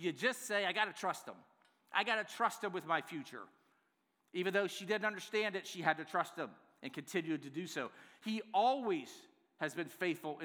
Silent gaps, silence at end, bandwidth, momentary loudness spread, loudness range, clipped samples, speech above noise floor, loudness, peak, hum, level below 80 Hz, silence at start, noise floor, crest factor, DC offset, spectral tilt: none; 0 s; over 20 kHz; 13 LU; 2 LU; under 0.1%; 42 dB; -38 LUFS; -16 dBFS; none; under -90 dBFS; 0 s; -80 dBFS; 24 dB; under 0.1%; -3.5 dB/octave